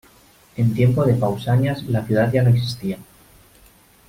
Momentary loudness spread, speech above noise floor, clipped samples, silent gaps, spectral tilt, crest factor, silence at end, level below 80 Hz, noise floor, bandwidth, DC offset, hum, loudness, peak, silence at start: 12 LU; 33 dB; under 0.1%; none; -8 dB/octave; 14 dB; 1.05 s; -48 dBFS; -52 dBFS; 15.5 kHz; under 0.1%; none; -19 LUFS; -6 dBFS; 0.55 s